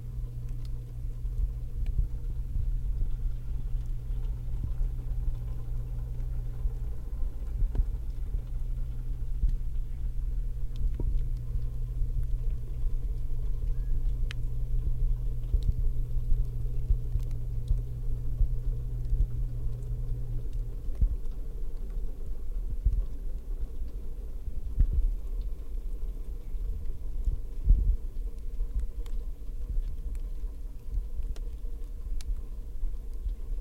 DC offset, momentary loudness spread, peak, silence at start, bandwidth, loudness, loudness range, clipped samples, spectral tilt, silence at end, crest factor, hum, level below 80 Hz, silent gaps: under 0.1%; 8 LU; -12 dBFS; 0 s; 4.1 kHz; -36 LUFS; 4 LU; under 0.1%; -8 dB/octave; 0 s; 18 dB; none; -30 dBFS; none